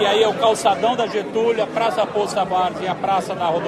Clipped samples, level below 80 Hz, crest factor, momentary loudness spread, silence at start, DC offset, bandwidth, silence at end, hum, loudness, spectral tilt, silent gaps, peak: under 0.1%; -58 dBFS; 14 dB; 5 LU; 0 s; under 0.1%; 13.5 kHz; 0 s; none; -19 LUFS; -4 dB/octave; none; -4 dBFS